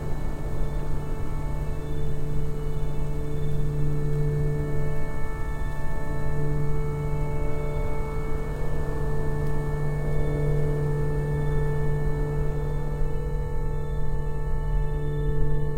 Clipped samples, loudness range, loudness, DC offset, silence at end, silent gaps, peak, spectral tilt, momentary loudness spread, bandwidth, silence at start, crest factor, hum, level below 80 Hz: under 0.1%; 3 LU; -30 LUFS; under 0.1%; 0 s; none; -10 dBFS; -8.5 dB/octave; 6 LU; 9.2 kHz; 0 s; 12 dB; none; -28 dBFS